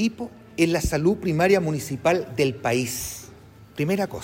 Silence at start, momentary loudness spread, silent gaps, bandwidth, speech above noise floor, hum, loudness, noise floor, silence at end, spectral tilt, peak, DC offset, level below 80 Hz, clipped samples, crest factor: 0 s; 14 LU; none; 16.5 kHz; 24 dB; none; -23 LUFS; -47 dBFS; 0 s; -5.5 dB/octave; -8 dBFS; under 0.1%; -44 dBFS; under 0.1%; 16 dB